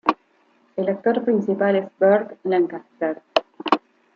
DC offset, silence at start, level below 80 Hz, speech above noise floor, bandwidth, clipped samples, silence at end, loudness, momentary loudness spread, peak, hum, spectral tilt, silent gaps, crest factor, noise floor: under 0.1%; 0.05 s; -70 dBFS; 40 dB; 7.2 kHz; under 0.1%; 0.4 s; -22 LUFS; 9 LU; -2 dBFS; none; -7 dB/octave; none; 20 dB; -60 dBFS